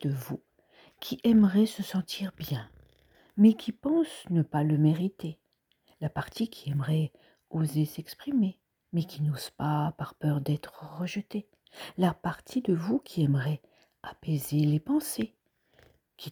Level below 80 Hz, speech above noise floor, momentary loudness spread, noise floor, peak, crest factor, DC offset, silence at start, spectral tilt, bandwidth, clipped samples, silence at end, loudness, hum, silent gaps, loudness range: -64 dBFS; 42 dB; 15 LU; -70 dBFS; -10 dBFS; 20 dB; under 0.1%; 0 s; -7 dB/octave; over 20 kHz; under 0.1%; 0 s; -29 LUFS; none; none; 5 LU